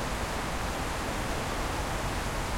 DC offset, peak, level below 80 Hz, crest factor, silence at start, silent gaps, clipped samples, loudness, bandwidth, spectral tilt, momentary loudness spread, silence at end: under 0.1%; -18 dBFS; -38 dBFS; 12 dB; 0 s; none; under 0.1%; -32 LUFS; 16.5 kHz; -4 dB/octave; 1 LU; 0 s